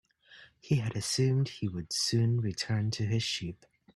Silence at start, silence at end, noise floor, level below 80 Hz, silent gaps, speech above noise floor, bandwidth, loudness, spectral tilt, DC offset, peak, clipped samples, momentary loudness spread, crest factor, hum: 0.3 s; 0.4 s; -57 dBFS; -62 dBFS; none; 27 dB; 12.5 kHz; -31 LUFS; -5 dB/octave; under 0.1%; -16 dBFS; under 0.1%; 6 LU; 16 dB; none